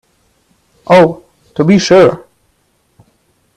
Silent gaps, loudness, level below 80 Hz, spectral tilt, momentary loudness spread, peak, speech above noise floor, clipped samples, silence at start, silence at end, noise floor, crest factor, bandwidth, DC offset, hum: none; -9 LUFS; -50 dBFS; -6 dB/octave; 23 LU; 0 dBFS; 50 dB; under 0.1%; 0.9 s; 1.4 s; -58 dBFS; 12 dB; 11.5 kHz; under 0.1%; none